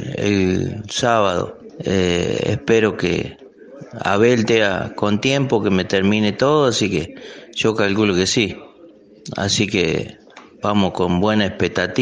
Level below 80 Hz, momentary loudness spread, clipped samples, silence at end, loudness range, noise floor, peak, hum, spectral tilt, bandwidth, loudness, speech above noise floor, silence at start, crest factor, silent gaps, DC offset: -50 dBFS; 10 LU; under 0.1%; 0 s; 3 LU; -45 dBFS; -2 dBFS; none; -5 dB/octave; 10 kHz; -18 LUFS; 27 dB; 0 s; 18 dB; none; under 0.1%